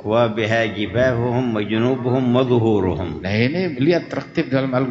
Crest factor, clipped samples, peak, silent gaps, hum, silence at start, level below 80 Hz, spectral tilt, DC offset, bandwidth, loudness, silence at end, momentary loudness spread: 14 dB; under 0.1%; -4 dBFS; none; none; 0 s; -48 dBFS; -7.5 dB/octave; under 0.1%; 7.4 kHz; -19 LUFS; 0 s; 5 LU